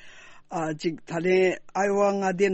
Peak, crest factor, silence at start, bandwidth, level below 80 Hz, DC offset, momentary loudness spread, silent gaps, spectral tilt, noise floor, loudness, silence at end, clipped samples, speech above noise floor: -12 dBFS; 14 dB; 0.05 s; 8.4 kHz; -62 dBFS; under 0.1%; 9 LU; none; -5.5 dB/octave; -47 dBFS; -25 LUFS; 0 s; under 0.1%; 22 dB